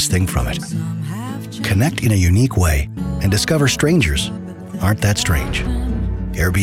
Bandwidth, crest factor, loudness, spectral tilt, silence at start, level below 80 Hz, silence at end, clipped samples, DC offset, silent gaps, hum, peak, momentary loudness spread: 16.5 kHz; 12 dB; -18 LUFS; -5 dB/octave; 0 s; -26 dBFS; 0 s; under 0.1%; under 0.1%; none; none; -6 dBFS; 10 LU